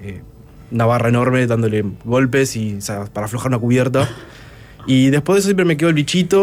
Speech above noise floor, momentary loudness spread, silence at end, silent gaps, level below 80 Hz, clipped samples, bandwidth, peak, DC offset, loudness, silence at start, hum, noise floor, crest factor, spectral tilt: 23 dB; 11 LU; 0 s; none; -46 dBFS; under 0.1%; 16 kHz; -4 dBFS; under 0.1%; -17 LUFS; 0 s; none; -39 dBFS; 12 dB; -6 dB/octave